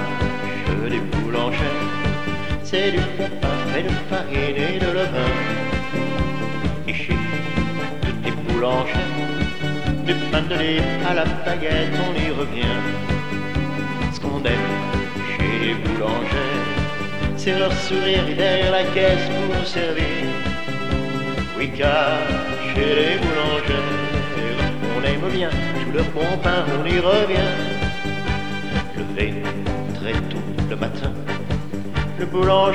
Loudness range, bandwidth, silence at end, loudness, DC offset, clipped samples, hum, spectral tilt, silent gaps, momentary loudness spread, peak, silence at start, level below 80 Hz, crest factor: 3 LU; 13 kHz; 0 s; -22 LUFS; 4%; under 0.1%; none; -6 dB/octave; none; 7 LU; -4 dBFS; 0 s; -32 dBFS; 18 dB